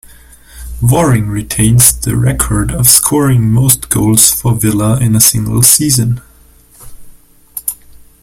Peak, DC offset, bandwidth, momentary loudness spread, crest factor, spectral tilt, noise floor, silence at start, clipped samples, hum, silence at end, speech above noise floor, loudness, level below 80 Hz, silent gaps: 0 dBFS; under 0.1%; over 20 kHz; 13 LU; 12 dB; -4 dB/octave; -42 dBFS; 0.55 s; 0.6%; none; 0.5 s; 33 dB; -9 LUFS; -28 dBFS; none